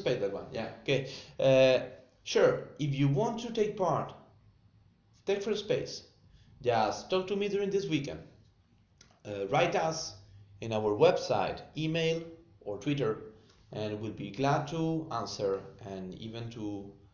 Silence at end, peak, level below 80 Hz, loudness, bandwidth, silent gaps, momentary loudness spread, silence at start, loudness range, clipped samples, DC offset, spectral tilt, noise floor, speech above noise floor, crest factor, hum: 0.2 s; -12 dBFS; -64 dBFS; -31 LUFS; 7.4 kHz; none; 16 LU; 0 s; 6 LU; under 0.1%; under 0.1%; -5.5 dB/octave; -66 dBFS; 35 dB; 20 dB; none